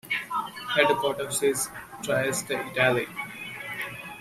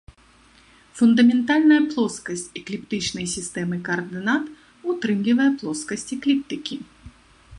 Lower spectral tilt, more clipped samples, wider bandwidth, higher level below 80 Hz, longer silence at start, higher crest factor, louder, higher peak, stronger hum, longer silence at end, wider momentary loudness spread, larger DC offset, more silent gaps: second, -3 dB/octave vs -4.5 dB/octave; neither; first, 16 kHz vs 11.5 kHz; second, -64 dBFS vs -56 dBFS; second, 0.05 s vs 0.95 s; first, 22 dB vs 16 dB; second, -27 LUFS vs -22 LUFS; about the same, -4 dBFS vs -6 dBFS; neither; about the same, 0 s vs 0 s; about the same, 12 LU vs 14 LU; neither; neither